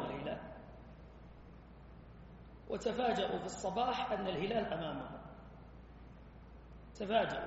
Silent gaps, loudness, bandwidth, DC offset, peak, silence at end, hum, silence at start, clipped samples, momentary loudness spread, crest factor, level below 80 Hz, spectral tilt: none; -38 LUFS; 7.6 kHz; under 0.1%; -20 dBFS; 0 s; none; 0 s; under 0.1%; 22 LU; 20 dB; -58 dBFS; -3.5 dB/octave